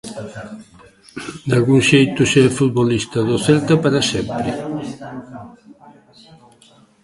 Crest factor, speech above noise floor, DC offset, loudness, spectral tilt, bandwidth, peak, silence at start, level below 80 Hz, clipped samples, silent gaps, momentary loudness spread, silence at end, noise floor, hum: 18 dB; 33 dB; under 0.1%; -16 LUFS; -5.5 dB/octave; 11.5 kHz; 0 dBFS; 0.05 s; -48 dBFS; under 0.1%; none; 21 LU; 1.55 s; -50 dBFS; none